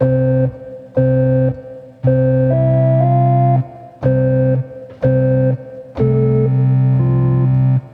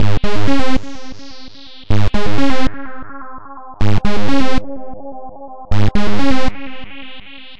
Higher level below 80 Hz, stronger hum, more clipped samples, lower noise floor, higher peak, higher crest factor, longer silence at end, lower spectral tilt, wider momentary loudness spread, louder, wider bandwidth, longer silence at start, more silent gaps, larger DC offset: second, -40 dBFS vs -28 dBFS; neither; neither; about the same, -33 dBFS vs -36 dBFS; about the same, -2 dBFS vs 0 dBFS; about the same, 12 dB vs 10 dB; about the same, 0.05 s vs 0 s; first, -12.5 dB/octave vs -6.5 dB/octave; second, 9 LU vs 17 LU; first, -15 LUFS vs -19 LUFS; second, 2.8 kHz vs 9.8 kHz; about the same, 0 s vs 0 s; neither; second, under 0.1% vs 20%